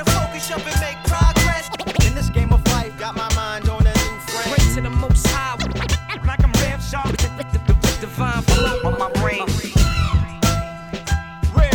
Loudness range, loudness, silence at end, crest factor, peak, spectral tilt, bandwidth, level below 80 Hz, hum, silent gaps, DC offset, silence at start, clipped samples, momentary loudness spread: 1 LU; -20 LUFS; 0 s; 16 dB; -2 dBFS; -4.5 dB/octave; 19.5 kHz; -22 dBFS; none; none; under 0.1%; 0 s; under 0.1%; 6 LU